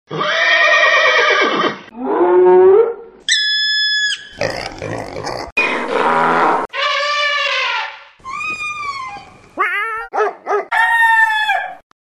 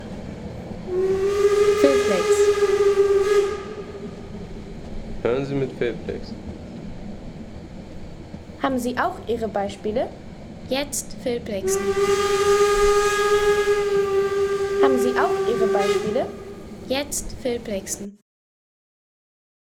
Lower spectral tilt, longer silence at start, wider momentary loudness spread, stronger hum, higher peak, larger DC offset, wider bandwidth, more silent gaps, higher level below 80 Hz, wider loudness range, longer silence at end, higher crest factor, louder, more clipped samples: second, -2.5 dB/octave vs -4 dB/octave; about the same, 0.1 s vs 0 s; second, 15 LU vs 19 LU; neither; first, 0 dBFS vs -4 dBFS; neither; second, 12.5 kHz vs 16.5 kHz; first, 5.52-5.56 s vs none; second, -52 dBFS vs -42 dBFS; second, 7 LU vs 10 LU; second, 0.25 s vs 1.6 s; about the same, 16 dB vs 20 dB; first, -14 LUFS vs -21 LUFS; neither